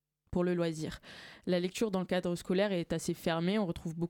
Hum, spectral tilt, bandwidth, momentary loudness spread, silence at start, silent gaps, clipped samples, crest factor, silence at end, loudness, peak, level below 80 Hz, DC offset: none; -6 dB/octave; 17.5 kHz; 10 LU; 0.3 s; none; under 0.1%; 16 dB; 0 s; -34 LUFS; -18 dBFS; -58 dBFS; under 0.1%